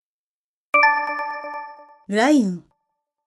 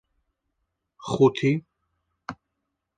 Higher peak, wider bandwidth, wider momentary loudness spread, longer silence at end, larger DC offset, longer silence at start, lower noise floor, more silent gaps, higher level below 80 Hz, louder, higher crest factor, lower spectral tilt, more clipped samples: about the same, -4 dBFS vs -6 dBFS; first, 12 kHz vs 9.2 kHz; about the same, 19 LU vs 21 LU; about the same, 0.65 s vs 0.65 s; neither; second, 0.75 s vs 1 s; first, under -90 dBFS vs -81 dBFS; neither; second, -74 dBFS vs -62 dBFS; first, -19 LUFS vs -23 LUFS; about the same, 20 dB vs 22 dB; second, -5 dB/octave vs -7 dB/octave; neither